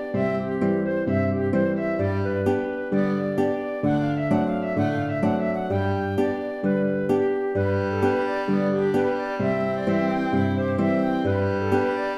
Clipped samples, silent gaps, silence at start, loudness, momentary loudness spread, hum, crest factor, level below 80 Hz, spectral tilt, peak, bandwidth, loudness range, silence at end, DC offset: under 0.1%; none; 0 s; -24 LUFS; 2 LU; none; 16 dB; -56 dBFS; -8.5 dB/octave; -8 dBFS; 12 kHz; 1 LU; 0 s; under 0.1%